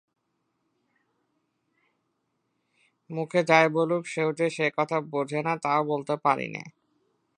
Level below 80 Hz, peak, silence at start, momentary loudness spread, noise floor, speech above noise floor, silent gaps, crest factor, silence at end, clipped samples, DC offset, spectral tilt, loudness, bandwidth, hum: -80 dBFS; -4 dBFS; 3.1 s; 11 LU; -77 dBFS; 51 dB; none; 24 dB; 0.7 s; under 0.1%; under 0.1%; -5.5 dB/octave; -26 LUFS; 10.5 kHz; none